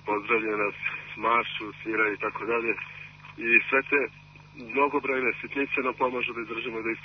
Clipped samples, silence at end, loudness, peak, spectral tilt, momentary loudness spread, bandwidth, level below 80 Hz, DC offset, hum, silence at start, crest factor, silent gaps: under 0.1%; 0 s; -27 LUFS; -8 dBFS; -6 dB/octave; 11 LU; 6.4 kHz; -64 dBFS; under 0.1%; 50 Hz at -55 dBFS; 0.05 s; 20 dB; none